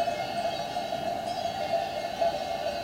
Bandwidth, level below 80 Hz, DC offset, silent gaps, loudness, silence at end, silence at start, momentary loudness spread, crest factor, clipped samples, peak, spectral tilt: 16 kHz; -58 dBFS; under 0.1%; none; -31 LUFS; 0 s; 0 s; 3 LU; 14 dB; under 0.1%; -16 dBFS; -4 dB/octave